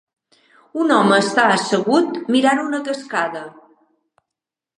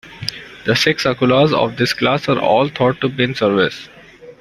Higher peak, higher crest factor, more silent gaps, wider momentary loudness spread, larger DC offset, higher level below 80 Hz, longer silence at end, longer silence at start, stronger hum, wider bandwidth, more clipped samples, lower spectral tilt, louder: about the same, -2 dBFS vs 0 dBFS; about the same, 18 dB vs 16 dB; neither; about the same, 11 LU vs 12 LU; neither; second, -74 dBFS vs -50 dBFS; first, 1.3 s vs 0.1 s; first, 0.75 s vs 0.05 s; neither; second, 11 kHz vs 16 kHz; neither; about the same, -4.5 dB/octave vs -5.5 dB/octave; about the same, -17 LUFS vs -16 LUFS